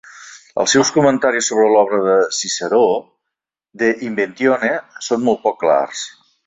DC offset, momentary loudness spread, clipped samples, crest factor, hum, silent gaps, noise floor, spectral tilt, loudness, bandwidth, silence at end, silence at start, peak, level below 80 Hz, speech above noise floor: under 0.1%; 10 LU; under 0.1%; 16 dB; none; none; -81 dBFS; -3 dB/octave; -16 LUFS; 8.2 kHz; 0.35 s; 0.15 s; -2 dBFS; -60 dBFS; 66 dB